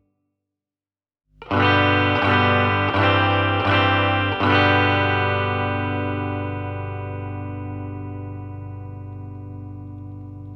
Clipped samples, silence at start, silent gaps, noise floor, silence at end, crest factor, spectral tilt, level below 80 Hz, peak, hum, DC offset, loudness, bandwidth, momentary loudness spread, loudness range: under 0.1%; 1.4 s; none; under -90 dBFS; 0 s; 16 dB; -7.5 dB/octave; -52 dBFS; -4 dBFS; 50 Hz at -45 dBFS; under 0.1%; -19 LUFS; 6 kHz; 19 LU; 15 LU